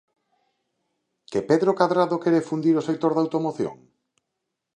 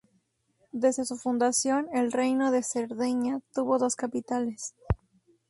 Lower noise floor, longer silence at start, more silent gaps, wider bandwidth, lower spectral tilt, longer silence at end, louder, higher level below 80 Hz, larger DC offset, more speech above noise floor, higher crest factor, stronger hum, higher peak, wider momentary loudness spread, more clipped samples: first, -81 dBFS vs -72 dBFS; first, 1.3 s vs 0.75 s; neither; second, 9.8 kHz vs 11.5 kHz; first, -7 dB/octave vs -4.5 dB/octave; first, 1 s vs 0.55 s; first, -23 LUFS vs -28 LUFS; second, -70 dBFS vs -48 dBFS; neither; first, 60 dB vs 44 dB; about the same, 22 dB vs 18 dB; neither; first, -4 dBFS vs -10 dBFS; about the same, 9 LU vs 9 LU; neither